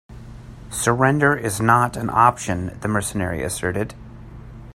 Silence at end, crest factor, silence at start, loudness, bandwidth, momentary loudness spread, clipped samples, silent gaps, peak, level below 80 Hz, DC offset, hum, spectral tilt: 0.05 s; 22 dB; 0.1 s; -20 LUFS; 16 kHz; 24 LU; under 0.1%; none; 0 dBFS; -44 dBFS; under 0.1%; none; -5 dB/octave